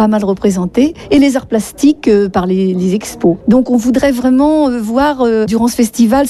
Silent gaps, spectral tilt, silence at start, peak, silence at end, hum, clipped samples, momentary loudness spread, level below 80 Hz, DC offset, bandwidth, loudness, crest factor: none; -6 dB/octave; 0 s; 0 dBFS; 0 s; none; under 0.1%; 4 LU; -38 dBFS; under 0.1%; 14 kHz; -12 LUFS; 10 dB